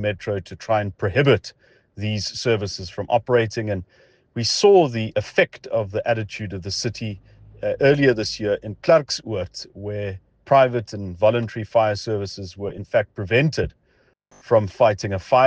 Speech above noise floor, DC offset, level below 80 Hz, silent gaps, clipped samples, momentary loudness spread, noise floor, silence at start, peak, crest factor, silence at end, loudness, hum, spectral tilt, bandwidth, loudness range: 41 dB; under 0.1%; -50 dBFS; none; under 0.1%; 14 LU; -62 dBFS; 0 s; -4 dBFS; 18 dB; 0 s; -21 LUFS; none; -5.5 dB/octave; 9.6 kHz; 3 LU